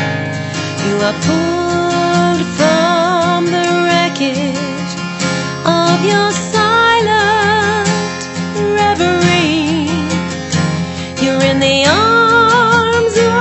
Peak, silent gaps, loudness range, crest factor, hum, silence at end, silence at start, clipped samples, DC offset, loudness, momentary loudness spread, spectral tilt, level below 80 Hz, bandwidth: 0 dBFS; none; 2 LU; 12 dB; none; 0 s; 0 s; under 0.1%; under 0.1%; -13 LUFS; 9 LU; -4.5 dB/octave; -44 dBFS; 8.4 kHz